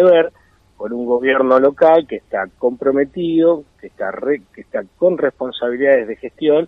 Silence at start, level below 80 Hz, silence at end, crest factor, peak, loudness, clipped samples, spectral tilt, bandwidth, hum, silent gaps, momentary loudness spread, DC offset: 0 s; -56 dBFS; 0 s; 14 dB; -2 dBFS; -17 LUFS; under 0.1%; -8 dB/octave; 4.4 kHz; none; none; 14 LU; under 0.1%